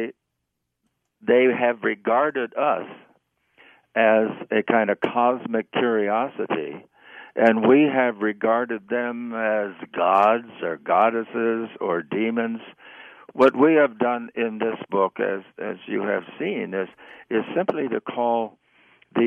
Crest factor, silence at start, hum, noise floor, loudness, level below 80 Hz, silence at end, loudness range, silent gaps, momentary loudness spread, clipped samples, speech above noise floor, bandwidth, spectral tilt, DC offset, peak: 18 dB; 0 s; none; -79 dBFS; -22 LUFS; -74 dBFS; 0 s; 5 LU; none; 12 LU; under 0.1%; 57 dB; 7.2 kHz; -7.5 dB/octave; under 0.1%; -4 dBFS